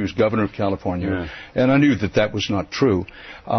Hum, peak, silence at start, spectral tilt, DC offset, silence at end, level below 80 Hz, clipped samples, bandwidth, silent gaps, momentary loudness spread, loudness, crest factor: none; -6 dBFS; 0 s; -6.5 dB/octave; under 0.1%; 0 s; -44 dBFS; under 0.1%; 6.4 kHz; none; 10 LU; -20 LUFS; 14 dB